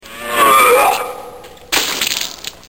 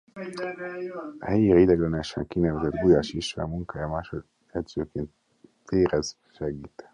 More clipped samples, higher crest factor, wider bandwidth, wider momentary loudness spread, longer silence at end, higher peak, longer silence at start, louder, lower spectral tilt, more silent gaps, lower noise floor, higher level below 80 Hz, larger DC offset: neither; about the same, 16 dB vs 20 dB; first, 17.5 kHz vs 10.5 kHz; about the same, 15 LU vs 16 LU; about the same, 0.15 s vs 0.1 s; first, 0 dBFS vs -6 dBFS; about the same, 0.05 s vs 0.15 s; first, -13 LUFS vs -26 LUFS; second, -0.5 dB/octave vs -6.5 dB/octave; neither; second, -35 dBFS vs -55 dBFS; about the same, -48 dBFS vs -46 dBFS; first, 0.4% vs under 0.1%